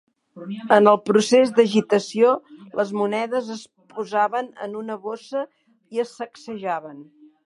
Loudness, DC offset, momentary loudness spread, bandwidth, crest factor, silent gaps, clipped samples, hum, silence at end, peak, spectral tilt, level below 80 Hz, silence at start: -21 LUFS; under 0.1%; 19 LU; 11.5 kHz; 22 dB; none; under 0.1%; none; 0.45 s; 0 dBFS; -5 dB/octave; -74 dBFS; 0.35 s